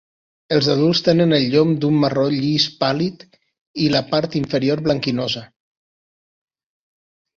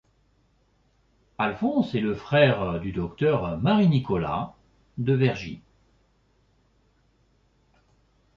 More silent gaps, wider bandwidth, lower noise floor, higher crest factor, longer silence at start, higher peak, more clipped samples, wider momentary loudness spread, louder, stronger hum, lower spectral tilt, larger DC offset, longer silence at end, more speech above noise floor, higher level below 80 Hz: first, 3.61-3.74 s vs none; about the same, 7.6 kHz vs 7 kHz; first, under -90 dBFS vs -65 dBFS; about the same, 18 dB vs 20 dB; second, 0.5 s vs 1.4 s; first, -2 dBFS vs -6 dBFS; neither; second, 7 LU vs 13 LU; first, -18 LUFS vs -24 LUFS; neither; second, -6.5 dB/octave vs -8.5 dB/octave; neither; second, 1.9 s vs 2.8 s; first, over 72 dB vs 42 dB; about the same, -54 dBFS vs -52 dBFS